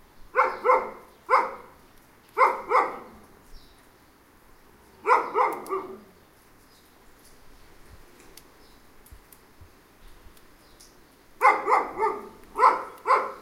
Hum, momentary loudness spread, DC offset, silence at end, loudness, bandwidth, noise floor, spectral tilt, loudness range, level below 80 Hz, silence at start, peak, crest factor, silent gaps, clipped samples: none; 17 LU; under 0.1%; 0 s; -24 LUFS; 16 kHz; -56 dBFS; -3.5 dB/octave; 5 LU; -58 dBFS; 0.35 s; -4 dBFS; 24 dB; none; under 0.1%